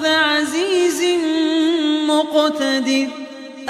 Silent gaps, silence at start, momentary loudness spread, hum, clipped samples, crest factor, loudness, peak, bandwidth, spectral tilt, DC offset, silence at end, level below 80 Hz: none; 0 s; 4 LU; none; under 0.1%; 14 dB; -17 LUFS; -4 dBFS; 15 kHz; -2 dB/octave; under 0.1%; 0 s; -66 dBFS